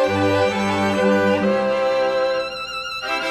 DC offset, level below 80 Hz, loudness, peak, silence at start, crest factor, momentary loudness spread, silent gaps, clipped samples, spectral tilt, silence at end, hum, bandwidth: under 0.1%; -54 dBFS; -19 LUFS; -6 dBFS; 0 s; 14 dB; 8 LU; none; under 0.1%; -5.5 dB/octave; 0 s; none; 13.5 kHz